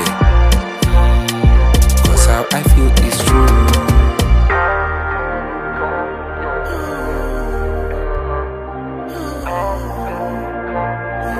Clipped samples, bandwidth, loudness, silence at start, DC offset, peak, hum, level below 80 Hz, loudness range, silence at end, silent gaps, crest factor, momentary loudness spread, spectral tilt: under 0.1%; 15.5 kHz; -16 LUFS; 0 s; under 0.1%; 0 dBFS; none; -16 dBFS; 10 LU; 0 s; none; 14 dB; 12 LU; -5 dB/octave